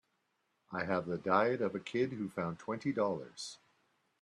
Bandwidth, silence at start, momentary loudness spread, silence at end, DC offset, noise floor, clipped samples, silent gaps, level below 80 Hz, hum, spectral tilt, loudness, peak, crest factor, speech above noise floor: 11.5 kHz; 0.7 s; 13 LU; 0.65 s; under 0.1%; -80 dBFS; under 0.1%; none; -76 dBFS; none; -6 dB/octave; -36 LUFS; -16 dBFS; 22 dB; 45 dB